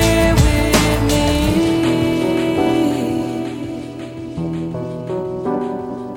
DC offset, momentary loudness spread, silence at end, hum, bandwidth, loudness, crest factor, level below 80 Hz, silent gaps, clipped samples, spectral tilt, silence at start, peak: under 0.1%; 12 LU; 0 s; none; 17 kHz; -18 LUFS; 16 dB; -26 dBFS; none; under 0.1%; -5.5 dB/octave; 0 s; -2 dBFS